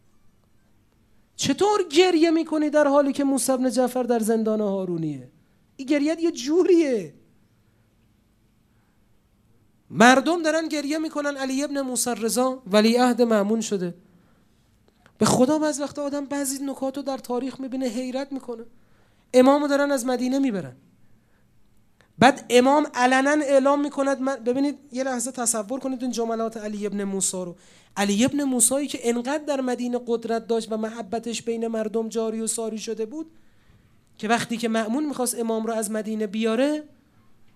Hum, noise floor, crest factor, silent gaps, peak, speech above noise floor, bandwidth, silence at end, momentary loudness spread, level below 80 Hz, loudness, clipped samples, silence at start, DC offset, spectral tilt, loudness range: none; -62 dBFS; 24 dB; none; 0 dBFS; 39 dB; 15.5 kHz; 0.7 s; 11 LU; -66 dBFS; -23 LUFS; under 0.1%; 1.4 s; under 0.1%; -3.5 dB/octave; 6 LU